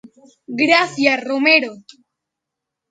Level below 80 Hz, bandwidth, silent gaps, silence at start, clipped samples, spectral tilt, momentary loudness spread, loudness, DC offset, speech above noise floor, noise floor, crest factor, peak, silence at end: -70 dBFS; 9.2 kHz; none; 0.5 s; under 0.1%; -3.5 dB/octave; 12 LU; -15 LUFS; under 0.1%; 65 dB; -82 dBFS; 20 dB; 0 dBFS; 1.1 s